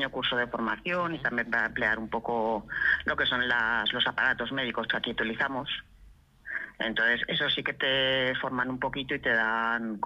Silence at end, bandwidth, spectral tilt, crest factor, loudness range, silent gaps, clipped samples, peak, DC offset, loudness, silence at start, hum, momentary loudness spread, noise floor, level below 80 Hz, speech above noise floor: 0 s; 10.5 kHz; -5.5 dB/octave; 16 dB; 3 LU; none; under 0.1%; -12 dBFS; under 0.1%; -28 LUFS; 0 s; none; 6 LU; -56 dBFS; -56 dBFS; 27 dB